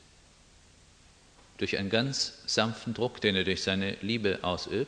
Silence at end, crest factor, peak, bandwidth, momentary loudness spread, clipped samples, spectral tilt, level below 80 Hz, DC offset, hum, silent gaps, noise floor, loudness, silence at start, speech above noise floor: 0 s; 24 dB; -8 dBFS; 10 kHz; 5 LU; under 0.1%; -4 dB/octave; -60 dBFS; under 0.1%; none; none; -58 dBFS; -30 LUFS; 1.6 s; 28 dB